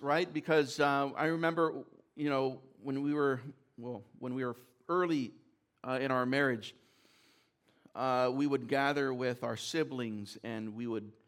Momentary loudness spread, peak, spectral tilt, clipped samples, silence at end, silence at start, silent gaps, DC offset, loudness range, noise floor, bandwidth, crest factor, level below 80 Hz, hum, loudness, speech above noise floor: 14 LU; -16 dBFS; -5.5 dB/octave; under 0.1%; 0.15 s; 0 s; none; under 0.1%; 4 LU; -71 dBFS; 15.5 kHz; 18 dB; -82 dBFS; none; -34 LUFS; 37 dB